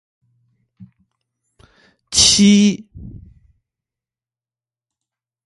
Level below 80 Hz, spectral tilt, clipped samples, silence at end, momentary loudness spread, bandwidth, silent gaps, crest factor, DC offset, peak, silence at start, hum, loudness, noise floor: -46 dBFS; -3 dB/octave; under 0.1%; 2.35 s; 10 LU; 11.5 kHz; none; 20 dB; under 0.1%; 0 dBFS; 2.1 s; none; -12 LUFS; under -90 dBFS